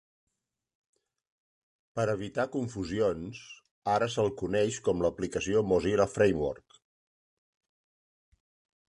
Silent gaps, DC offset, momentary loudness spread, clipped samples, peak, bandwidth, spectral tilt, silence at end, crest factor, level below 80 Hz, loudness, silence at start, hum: 3.71-3.82 s; under 0.1%; 13 LU; under 0.1%; -12 dBFS; 11 kHz; -5.5 dB/octave; 2.35 s; 20 dB; -56 dBFS; -30 LUFS; 1.95 s; none